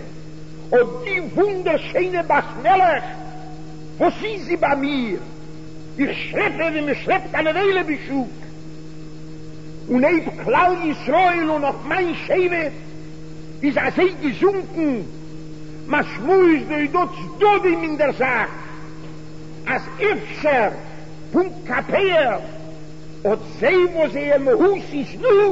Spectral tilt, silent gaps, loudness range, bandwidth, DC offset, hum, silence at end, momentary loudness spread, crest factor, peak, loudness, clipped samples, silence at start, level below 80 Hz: -6.5 dB/octave; none; 4 LU; 8 kHz; 2%; none; 0 s; 21 LU; 16 dB; -4 dBFS; -19 LUFS; under 0.1%; 0 s; -46 dBFS